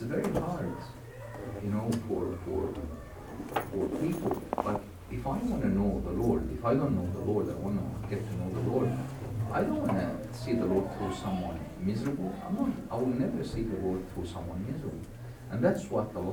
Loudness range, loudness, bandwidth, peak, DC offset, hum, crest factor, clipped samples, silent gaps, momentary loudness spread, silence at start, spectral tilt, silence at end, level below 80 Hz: 3 LU; -33 LUFS; over 20 kHz; -12 dBFS; under 0.1%; none; 20 dB; under 0.1%; none; 10 LU; 0 s; -8 dB/octave; 0 s; -48 dBFS